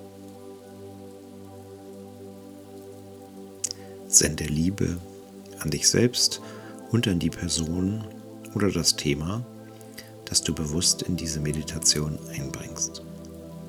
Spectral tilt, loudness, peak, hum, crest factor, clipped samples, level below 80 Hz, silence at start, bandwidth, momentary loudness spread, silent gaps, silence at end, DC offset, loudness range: -3 dB/octave; -25 LUFS; -2 dBFS; none; 26 dB; under 0.1%; -48 dBFS; 0 s; 20 kHz; 23 LU; none; 0 s; under 0.1%; 15 LU